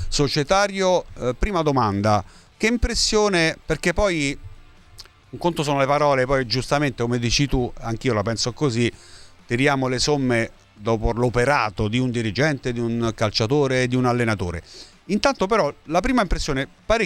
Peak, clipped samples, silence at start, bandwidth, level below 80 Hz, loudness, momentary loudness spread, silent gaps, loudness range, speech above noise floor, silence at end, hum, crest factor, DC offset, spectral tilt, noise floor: -2 dBFS; under 0.1%; 0 s; 13.5 kHz; -34 dBFS; -21 LUFS; 7 LU; none; 2 LU; 25 dB; 0 s; none; 20 dB; under 0.1%; -5 dB/octave; -46 dBFS